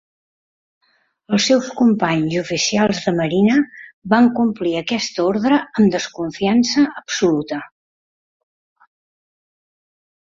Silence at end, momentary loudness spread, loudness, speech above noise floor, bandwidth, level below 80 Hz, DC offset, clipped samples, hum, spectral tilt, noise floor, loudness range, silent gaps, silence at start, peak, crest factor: 2.65 s; 7 LU; -17 LUFS; over 73 dB; 7.8 kHz; -58 dBFS; under 0.1%; under 0.1%; none; -4.5 dB/octave; under -90 dBFS; 5 LU; 3.93-4.02 s; 1.3 s; -2 dBFS; 16 dB